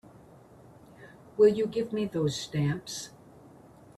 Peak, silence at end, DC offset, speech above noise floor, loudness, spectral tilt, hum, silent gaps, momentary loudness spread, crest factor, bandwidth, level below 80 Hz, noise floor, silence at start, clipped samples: -12 dBFS; 0.9 s; under 0.1%; 26 dB; -28 LUFS; -6 dB/octave; none; none; 16 LU; 20 dB; 13 kHz; -64 dBFS; -54 dBFS; 1 s; under 0.1%